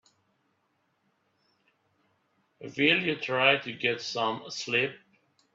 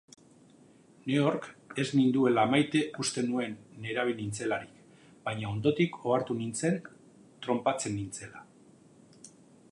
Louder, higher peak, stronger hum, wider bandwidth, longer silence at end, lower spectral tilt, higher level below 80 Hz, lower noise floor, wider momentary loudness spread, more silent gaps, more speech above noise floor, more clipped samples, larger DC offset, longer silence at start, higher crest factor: first, -27 LUFS vs -30 LUFS; first, -6 dBFS vs -12 dBFS; neither; second, 7.8 kHz vs 11.5 kHz; about the same, 0.55 s vs 0.45 s; second, -3.5 dB/octave vs -5 dB/octave; second, -76 dBFS vs -68 dBFS; first, -74 dBFS vs -59 dBFS; second, 11 LU vs 15 LU; neither; first, 46 dB vs 29 dB; neither; neither; first, 2.6 s vs 1.05 s; about the same, 24 dB vs 20 dB